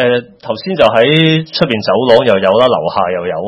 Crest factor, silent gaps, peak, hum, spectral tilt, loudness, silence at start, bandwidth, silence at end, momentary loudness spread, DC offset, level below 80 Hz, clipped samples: 12 dB; none; 0 dBFS; none; -7 dB/octave; -11 LUFS; 0 s; 8.2 kHz; 0 s; 9 LU; under 0.1%; -50 dBFS; 0.4%